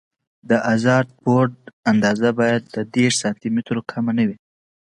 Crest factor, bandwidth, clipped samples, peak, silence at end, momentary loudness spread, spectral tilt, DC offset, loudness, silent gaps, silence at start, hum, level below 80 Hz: 18 dB; 11.5 kHz; under 0.1%; -2 dBFS; 0.6 s; 7 LU; -5.5 dB/octave; under 0.1%; -20 LUFS; 1.73-1.83 s; 0.45 s; none; -60 dBFS